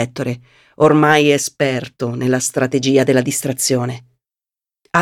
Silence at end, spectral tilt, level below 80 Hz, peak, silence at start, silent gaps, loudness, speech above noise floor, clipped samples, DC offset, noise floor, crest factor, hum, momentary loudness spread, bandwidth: 0 s; -4.5 dB/octave; -60 dBFS; 0 dBFS; 0 s; none; -16 LUFS; over 74 dB; under 0.1%; under 0.1%; under -90 dBFS; 16 dB; none; 13 LU; 17 kHz